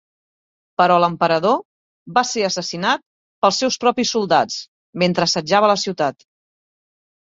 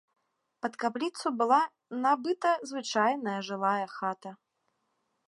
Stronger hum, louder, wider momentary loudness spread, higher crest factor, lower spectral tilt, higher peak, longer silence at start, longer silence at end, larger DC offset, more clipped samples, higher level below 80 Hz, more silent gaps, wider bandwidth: neither; first, -18 LUFS vs -30 LUFS; about the same, 8 LU vs 10 LU; about the same, 18 dB vs 20 dB; about the same, -3.5 dB/octave vs -4 dB/octave; first, -2 dBFS vs -10 dBFS; first, 0.8 s vs 0.65 s; first, 1.1 s vs 0.95 s; neither; neither; first, -62 dBFS vs -88 dBFS; first, 1.65-2.06 s, 3.06-3.42 s, 4.68-4.93 s vs none; second, 8 kHz vs 11.5 kHz